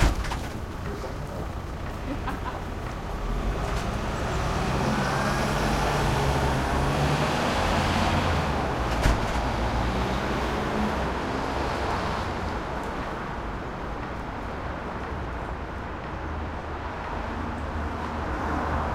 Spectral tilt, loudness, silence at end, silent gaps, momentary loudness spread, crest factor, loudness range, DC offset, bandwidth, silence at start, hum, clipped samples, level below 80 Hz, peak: -5.5 dB/octave; -28 LUFS; 0 s; none; 9 LU; 20 dB; 8 LU; under 0.1%; 16 kHz; 0 s; none; under 0.1%; -34 dBFS; -8 dBFS